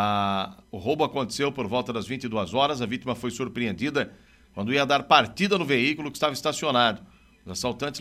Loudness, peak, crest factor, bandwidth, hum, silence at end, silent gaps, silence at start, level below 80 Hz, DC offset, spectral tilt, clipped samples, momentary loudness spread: -25 LUFS; -4 dBFS; 22 dB; 15.5 kHz; none; 0 s; none; 0 s; -58 dBFS; under 0.1%; -4.5 dB/octave; under 0.1%; 10 LU